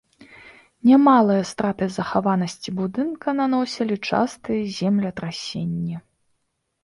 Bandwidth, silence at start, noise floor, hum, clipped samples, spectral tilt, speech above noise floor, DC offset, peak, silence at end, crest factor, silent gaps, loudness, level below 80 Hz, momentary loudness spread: 11.5 kHz; 0.2 s; -74 dBFS; none; under 0.1%; -6.5 dB/octave; 53 dB; under 0.1%; -4 dBFS; 0.85 s; 18 dB; none; -21 LUFS; -58 dBFS; 13 LU